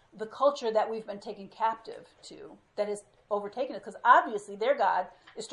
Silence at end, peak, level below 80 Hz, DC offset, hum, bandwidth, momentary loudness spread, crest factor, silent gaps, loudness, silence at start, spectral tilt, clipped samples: 0 s; -8 dBFS; -76 dBFS; under 0.1%; none; 11.5 kHz; 23 LU; 22 dB; none; -29 LUFS; 0.15 s; -3.5 dB/octave; under 0.1%